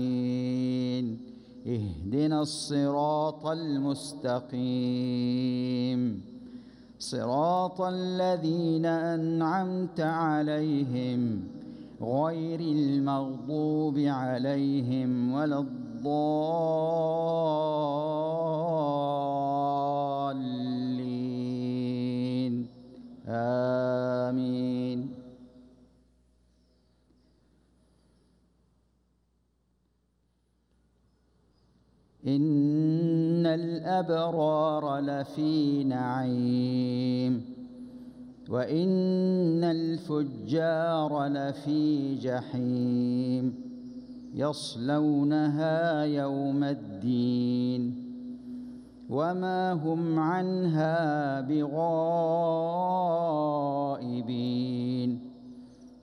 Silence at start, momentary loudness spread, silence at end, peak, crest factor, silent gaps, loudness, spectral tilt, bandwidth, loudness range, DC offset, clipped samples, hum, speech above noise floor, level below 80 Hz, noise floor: 0 s; 10 LU; 0.05 s; -14 dBFS; 14 dB; none; -29 LUFS; -7.5 dB/octave; 11 kHz; 3 LU; under 0.1%; under 0.1%; none; 44 dB; -66 dBFS; -72 dBFS